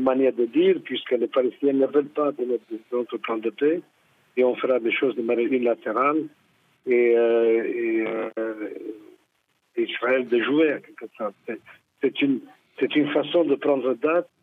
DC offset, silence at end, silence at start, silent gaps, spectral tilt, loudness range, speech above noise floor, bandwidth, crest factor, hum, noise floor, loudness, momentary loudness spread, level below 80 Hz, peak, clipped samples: under 0.1%; 0.2 s; 0 s; none; -7.5 dB/octave; 4 LU; 47 dB; 4 kHz; 14 dB; none; -70 dBFS; -23 LUFS; 12 LU; -78 dBFS; -8 dBFS; under 0.1%